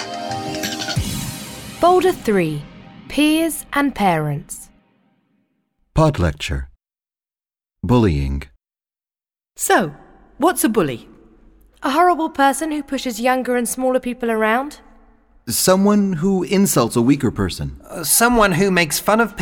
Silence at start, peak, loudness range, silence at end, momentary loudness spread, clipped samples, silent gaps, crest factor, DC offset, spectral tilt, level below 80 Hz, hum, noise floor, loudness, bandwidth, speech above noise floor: 0 s; -2 dBFS; 6 LU; 0 s; 14 LU; under 0.1%; none; 18 dB; under 0.1%; -4.5 dB/octave; -36 dBFS; none; under -90 dBFS; -18 LUFS; 19 kHz; over 73 dB